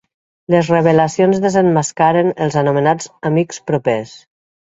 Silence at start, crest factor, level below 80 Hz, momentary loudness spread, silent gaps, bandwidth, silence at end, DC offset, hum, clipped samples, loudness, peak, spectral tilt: 0.5 s; 16 dB; -54 dBFS; 7 LU; none; 8 kHz; 0.6 s; under 0.1%; none; under 0.1%; -15 LUFS; 0 dBFS; -6 dB/octave